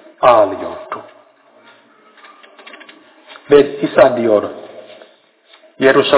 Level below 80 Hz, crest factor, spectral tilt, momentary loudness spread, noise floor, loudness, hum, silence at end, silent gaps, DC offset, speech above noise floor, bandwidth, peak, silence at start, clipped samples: -54 dBFS; 16 dB; -9 dB/octave; 23 LU; -49 dBFS; -13 LUFS; none; 0 s; none; under 0.1%; 37 dB; 4 kHz; 0 dBFS; 0.2 s; 0.3%